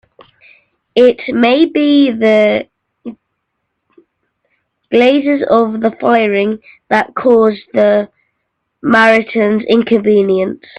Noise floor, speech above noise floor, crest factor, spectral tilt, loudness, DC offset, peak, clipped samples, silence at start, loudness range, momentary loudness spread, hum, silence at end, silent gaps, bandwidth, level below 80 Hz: -70 dBFS; 60 dB; 12 dB; -6.5 dB/octave; -12 LUFS; under 0.1%; 0 dBFS; under 0.1%; 0.95 s; 4 LU; 10 LU; none; 0.25 s; none; 8.8 kHz; -56 dBFS